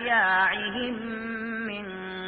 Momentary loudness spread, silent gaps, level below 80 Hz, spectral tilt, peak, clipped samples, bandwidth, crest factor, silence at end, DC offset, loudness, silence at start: 12 LU; none; -60 dBFS; -8 dB/octave; -10 dBFS; under 0.1%; 4.7 kHz; 16 dB; 0 s; under 0.1%; -27 LUFS; 0 s